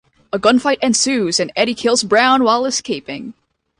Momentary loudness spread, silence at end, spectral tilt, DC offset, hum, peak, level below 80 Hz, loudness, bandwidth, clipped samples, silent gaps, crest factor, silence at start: 13 LU; 0.45 s; -2.5 dB/octave; under 0.1%; none; 0 dBFS; -56 dBFS; -15 LUFS; 11.5 kHz; under 0.1%; none; 16 dB; 0.35 s